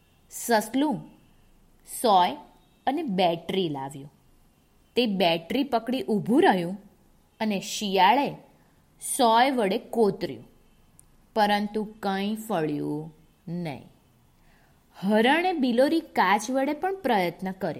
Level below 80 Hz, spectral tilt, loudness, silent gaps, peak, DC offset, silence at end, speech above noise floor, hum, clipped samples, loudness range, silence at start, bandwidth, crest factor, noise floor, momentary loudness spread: -62 dBFS; -4.5 dB/octave; -25 LUFS; none; -6 dBFS; under 0.1%; 0 s; 36 dB; none; under 0.1%; 5 LU; 0.3 s; 16 kHz; 20 dB; -61 dBFS; 15 LU